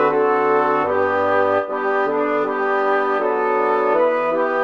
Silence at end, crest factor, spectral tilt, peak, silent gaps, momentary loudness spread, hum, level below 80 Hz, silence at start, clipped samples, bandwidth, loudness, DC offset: 0 s; 12 dB; -6.5 dB/octave; -6 dBFS; none; 3 LU; none; -62 dBFS; 0 s; under 0.1%; 6.6 kHz; -18 LUFS; 0.2%